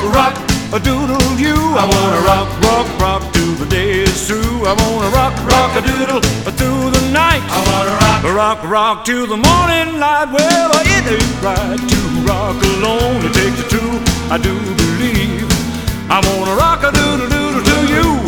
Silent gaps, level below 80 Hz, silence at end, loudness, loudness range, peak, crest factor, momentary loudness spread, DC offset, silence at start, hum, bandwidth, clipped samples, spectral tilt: none; -24 dBFS; 0 s; -13 LUFS; 2 LU; 0 dBFS; 14 dB; 5 LU; 0.7%; 0 s; none; over 20 kHz; under 0.1%; -4.5 dB/octave